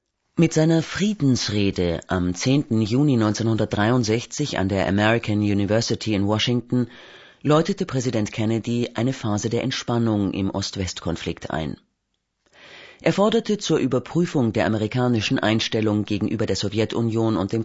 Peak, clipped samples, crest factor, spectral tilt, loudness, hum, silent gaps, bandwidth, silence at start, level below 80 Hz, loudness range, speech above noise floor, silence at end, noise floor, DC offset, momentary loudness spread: -4 dBFS; under 0.1%; 18 dB; -5.5 dB/octave; -22 LUFS; none; none; 8 kHz; 0.35 s; -50 dBFS; 5 LU; 54 dB; 0 s; -75 dBFS; under 0.1%; 6 LU